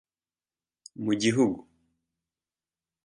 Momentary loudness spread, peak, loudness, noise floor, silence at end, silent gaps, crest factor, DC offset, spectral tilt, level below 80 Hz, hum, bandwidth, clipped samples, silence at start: 17 LU; -12 dBFS; -26 LUFS; under -90 dBFS; 1.45 s; none; 20 dB; under 0.1%; -5 dB/octave; -68 dBFS; none; 11 kHz; under 0.1%; 1 s